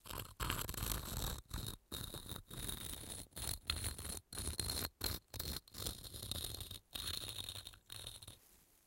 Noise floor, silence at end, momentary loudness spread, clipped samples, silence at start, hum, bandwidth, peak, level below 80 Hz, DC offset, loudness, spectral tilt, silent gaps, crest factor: -68 dBFS; 0.1 s; 8 LU; under 0.1%; 0.05 s; none; 17 kHz; -18 dBFS; -52 dBFS; under 0.1%; -44 LUFS; -2.5 dB/octave; none; 28 dB